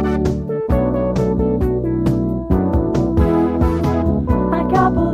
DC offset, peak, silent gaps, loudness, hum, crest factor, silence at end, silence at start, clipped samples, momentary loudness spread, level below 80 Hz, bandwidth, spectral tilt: under 0.1%; -2 dBFS; none; -17 LUFS; none; 14 dB; 0 s; 0 s; under 0.1%; 4 LU; -24 dBFS; 13.5 kHz; -9 dB/octave